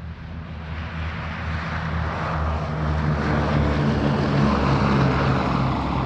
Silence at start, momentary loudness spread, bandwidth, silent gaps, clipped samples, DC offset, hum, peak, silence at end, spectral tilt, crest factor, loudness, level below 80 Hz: 0 s; 12 LU; 8 kHz; none; under 0.1%; under 0.1%; none; -8 dBFS; 0 s; -7.5 dB/octave; 14 dB; -23 LUFS; -32 dBFS